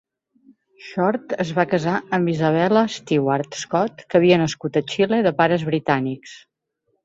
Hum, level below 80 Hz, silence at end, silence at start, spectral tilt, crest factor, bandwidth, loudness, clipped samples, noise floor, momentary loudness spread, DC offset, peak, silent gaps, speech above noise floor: none; -60 dBFS; 0.65 s; 0.8 s; -6 dB/octave; 18 dB; 8 kHz; -20 LUFS; under 0.1%; -72 dBFS; 7 LU; under 0.1%; -2 dBFS; none; 52 dB